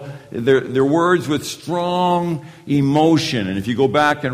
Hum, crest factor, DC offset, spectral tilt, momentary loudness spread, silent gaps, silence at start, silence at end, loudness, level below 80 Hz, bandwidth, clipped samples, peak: none; 16 dB; under 0.1%; -6 dB/octave; 8 LU; none; 0 s; 0 s; -18 LUFS; -54 dBFS; 15.5 kHz; under 0.1%; -2 dBFS